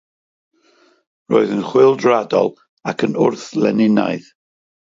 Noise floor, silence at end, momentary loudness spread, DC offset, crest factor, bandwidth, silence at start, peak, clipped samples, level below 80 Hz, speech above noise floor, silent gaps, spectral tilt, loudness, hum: -55 dBFS; 0.65 s; 10 LU; under 0.1%; 16 dB; 7.6 kHz; 1.3 s; 0 dBFS; under 0.1%; -66 dBFS; 40 dB; 2.68-2.77 s; -6.5 dB/octave; -16 LUFS; none